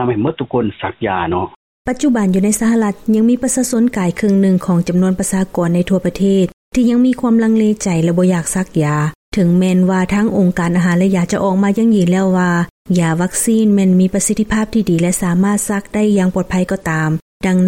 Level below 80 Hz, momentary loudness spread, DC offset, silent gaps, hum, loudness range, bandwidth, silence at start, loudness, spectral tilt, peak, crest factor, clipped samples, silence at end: -40 dBFS; 6 LU; under 0.1%; 1.56-1.85 s, 6.53-6.71 s, 9.15-9.32 s, 12.70-12.85 s, 17.22-17.40 s; none; 2 LU; 16.5 kHz; 0 s; -14 LUFS; -6 dB/octave; -4 dBFS; 10 dB; under 0.1%; 0 s